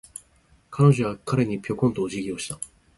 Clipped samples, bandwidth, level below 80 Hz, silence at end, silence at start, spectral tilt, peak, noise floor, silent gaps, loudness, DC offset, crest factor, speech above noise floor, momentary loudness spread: under 0.1%; 11.5 kHz; -54 dBFS; 0.3 s; 0.7 s; -6.5 dB/octave; -4 dBFS; -60 dBFS; none; -24 LUFS; under 0.1%; 20 dB; 37 dB; 19 LU